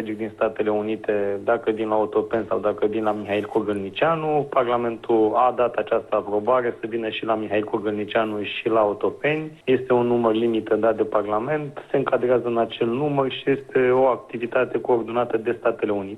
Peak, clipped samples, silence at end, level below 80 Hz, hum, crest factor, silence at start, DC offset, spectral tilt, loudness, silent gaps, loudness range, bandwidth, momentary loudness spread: -6 dBFS; under 0.1%; 0 s; -60 dBFS; none; 16 dB; 0 s; under 0.1%; -7.5 dB/octave; -22 LUFS; none; 2 LU; 10.5 kHz; 6 LU